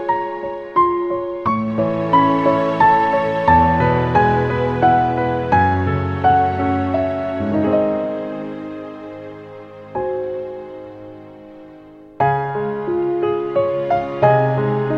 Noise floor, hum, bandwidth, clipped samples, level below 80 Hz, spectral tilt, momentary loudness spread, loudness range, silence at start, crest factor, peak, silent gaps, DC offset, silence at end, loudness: -41 dBFS; none; 7.4 kHz; under 0.1%; -42 dBFS; -9 dB/octave; 18 LU; 12 LU; 0 s; 16 dB; 0 dBFS; none; under 0.1%; 0 s; -17 LUFS